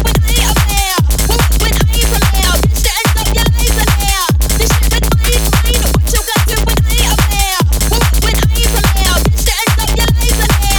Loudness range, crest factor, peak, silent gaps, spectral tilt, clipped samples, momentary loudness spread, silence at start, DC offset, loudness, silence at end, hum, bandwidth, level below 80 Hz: 0 LU; 10 dB; 0 dBFS; none; -3.5 dB/octave; under 0.1%; 1 LU; 0 s; under 0.1%; -12 LUFS; 0 s; none; over 20 kHz; -14 dBFS